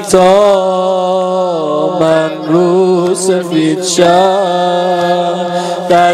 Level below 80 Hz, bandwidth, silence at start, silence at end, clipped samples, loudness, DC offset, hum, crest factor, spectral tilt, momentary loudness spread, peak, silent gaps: -50 dBFS; 14.5 kHz; 0 s; 0 s; 0.2%; -11 LUFS; under 0.1%; none; 10 dB; -5 dB/octave; 6 LU; 0 dBFS; none